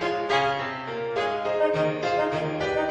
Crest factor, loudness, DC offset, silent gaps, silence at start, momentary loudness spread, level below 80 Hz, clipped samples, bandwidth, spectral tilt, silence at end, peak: 16 dB; -26 LUFS; under 0.1%; none; 0 s; 6 LU; -56 dBFS; under 0.1%; 9.8 kHz; -5.5 dB/octave; 0 s; -10 dBFS